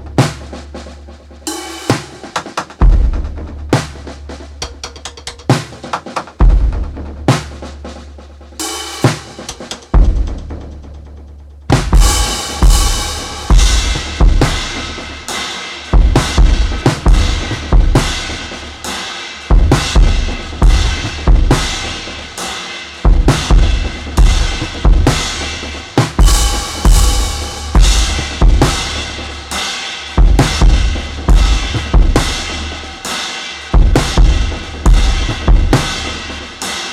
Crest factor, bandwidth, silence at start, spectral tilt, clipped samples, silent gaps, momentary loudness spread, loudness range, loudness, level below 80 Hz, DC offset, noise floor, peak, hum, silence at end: 12 dB; 14.5 kHz; 0 s; -4.5 dB/octave; under 0.1%; none; 15 LU; 5 LU; -15 LUFS; -14 dBFS; under 0.1%; -34 dBFS; 0 dBFS; none; 0 s